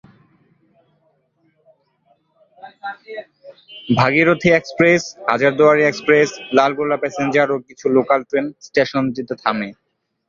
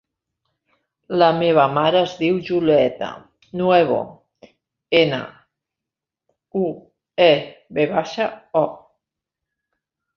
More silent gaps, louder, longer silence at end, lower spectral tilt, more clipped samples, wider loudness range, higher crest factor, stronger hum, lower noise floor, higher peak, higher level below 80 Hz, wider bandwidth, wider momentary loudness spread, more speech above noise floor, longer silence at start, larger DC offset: neither; first, -16 LUFS vs -19 LUFS; second, 0.55 s vs 1.4 s; about the same, -5.5 dB/octave vs -6.5 dB/octave; neither; about the same, 5 LU vs 4 LU; about the same, 18 dB vs 20 dB; neither; second, -63 dBFS vs -86 dBFS; about the same, 0 dBFS vs -2 dBFS; about the same, -58 dBFS vs -62 dBFS; about the same, 7.4 kHz vs 7 kHz; first, 18 LU vs 14 LU; second, 46 dB vs 68 dB; first, 2.65 s vs 1.1 s; neither